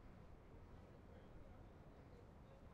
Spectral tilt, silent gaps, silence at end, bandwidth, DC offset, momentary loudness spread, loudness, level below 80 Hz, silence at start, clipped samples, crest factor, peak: -7 dB/octave; none; 0 s; 8 kHz; under 0.1%; 1 LU; -63 LUFS; -66 dBFS; 0 s; under 0.1%; 12 dB; -48 dBFS